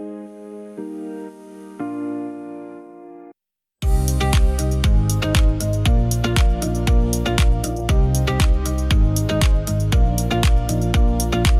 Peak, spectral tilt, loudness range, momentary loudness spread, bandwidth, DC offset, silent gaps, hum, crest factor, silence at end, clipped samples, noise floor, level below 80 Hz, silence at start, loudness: 0 dBFS; -5.5 dB/octave; 12 LU; 17 LU; 15 kHz; under 0.1%; none; none; 18 dB; 0 s; under 0.1%; -80 dBFS; -20 dBFS; 0 s; -19 LUFS